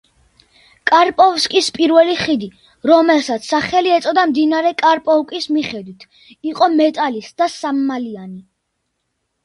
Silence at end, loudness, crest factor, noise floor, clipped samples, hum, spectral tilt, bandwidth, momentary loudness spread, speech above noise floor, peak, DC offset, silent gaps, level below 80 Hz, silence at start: 1.05 s; -15 LUFS; 16 dB; -72 dBFS; under 0.1%; none; -3.5 dB/octave; 11.5 kHz; 13 LU; 57 dB; 0 dBFS; under 0.1%; none; -58 dBFS; 0.85 s